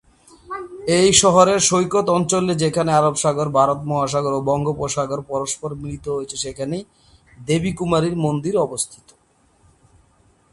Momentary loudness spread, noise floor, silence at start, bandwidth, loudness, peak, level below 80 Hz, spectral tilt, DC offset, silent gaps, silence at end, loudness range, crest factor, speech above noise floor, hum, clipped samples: 14 LU; -58 dBFS; 0.5 s; 11.5 kHz; -19 LUFS; 0 dBFS; -48 dBFS; -4 dB/octave; under 0.1%; none; 1.6 s; 8 LU; 20 dB; 39 dB; none; under 0.1%